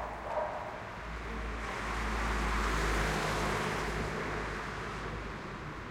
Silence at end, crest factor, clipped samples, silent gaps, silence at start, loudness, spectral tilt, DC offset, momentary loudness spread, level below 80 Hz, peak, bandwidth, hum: 0 s; 16 dB; under 0.1%; none; 0 s; -35 LUFS; -4.5 dB/octave; under 0.1%; 10 LU; -40 dBFS; -18 dBFS; 16 kHz; none